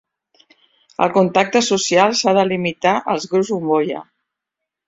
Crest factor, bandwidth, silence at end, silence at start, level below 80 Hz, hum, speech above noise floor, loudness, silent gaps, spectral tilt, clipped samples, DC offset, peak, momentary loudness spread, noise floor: 16 dB; 8 kHz; 0.85 s; 1 s; -62 dBFS; none; 66 dB; -17 LUFS; none; -4 dB/octave; under 0.1%; under 0.1%; -2 dBFS; 6 LU; -82 dBFS